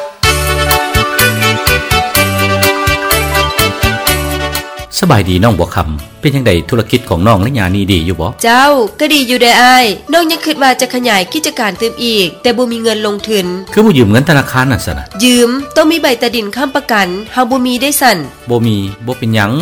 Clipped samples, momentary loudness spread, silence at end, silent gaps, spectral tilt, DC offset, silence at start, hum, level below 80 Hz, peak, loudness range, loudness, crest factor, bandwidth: 0.6%; 7 LU; 0 s; none; -4 dB/octave; under 0.1%; 0 s; none; -28 dBFS; 0 dBFS; 3 LU; -10 LUFS; 10 dB; over 20 kHz